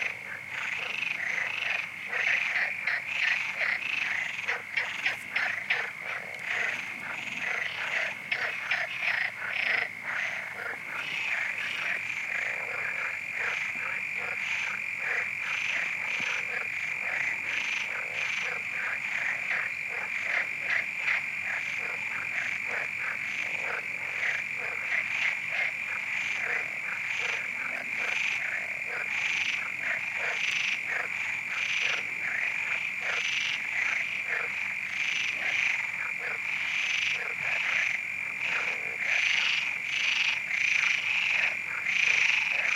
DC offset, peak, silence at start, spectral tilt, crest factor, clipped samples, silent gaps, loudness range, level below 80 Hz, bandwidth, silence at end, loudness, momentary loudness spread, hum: under 0.1%; -10 dBFS; 0 s; -0.5 dB/octave; 20 dB; under 0.1%; none; 4 LU; -78 dBFS; 16 kHz; 0 s; -28 LUFS; 6 LU; none